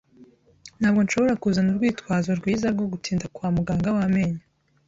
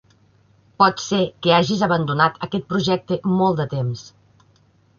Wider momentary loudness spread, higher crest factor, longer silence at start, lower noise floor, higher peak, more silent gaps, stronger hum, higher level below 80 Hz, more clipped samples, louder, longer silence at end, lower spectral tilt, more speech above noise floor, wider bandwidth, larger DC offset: about the same, 6 LU vs 8 LU; second, 14 dB vs 20 dB; second, 0.2 s vs 0.8 s; second, -53 dBFS vs -57 dBFS; second, -10 dBFS vs -2 dBFS; neither; neither; first, -50 dBFS vs -56 dBFS; neither; second, -23 LUFS vs -20 LUFS; second, 0.5 s vs 0.95 s; about the same, -6.5 dB/octave vs -5.5 dB/octave; second, 31 dB vs 38 dB; about the same, 7.8 kHz vs 7.2 kHz; neither